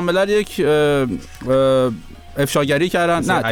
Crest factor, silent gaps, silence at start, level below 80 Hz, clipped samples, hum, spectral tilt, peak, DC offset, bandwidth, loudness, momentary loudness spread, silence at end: 14 dB; none; 0 s; -42 dBFS; under 0.1%; none; -5.5 dB/octave; -4 dBFS; under 0.1%; 19.5 kHz; -17 LUFS; 9 LU; 0 s